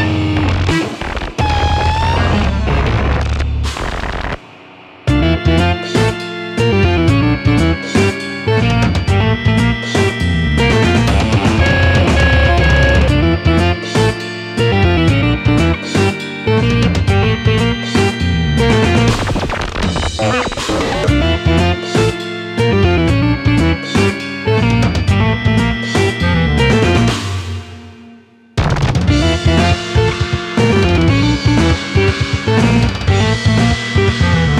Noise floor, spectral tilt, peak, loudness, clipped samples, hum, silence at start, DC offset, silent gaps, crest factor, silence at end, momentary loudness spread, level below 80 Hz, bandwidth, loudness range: -41 dBFS; -6 dB/octave; 0 dBFS; -14 LUFS; under 0.1%; none; 0 s; under 0.1%; none; 12 dB; 0 s; 7 LU; -22 dBFS; 12 kHz; 4 LU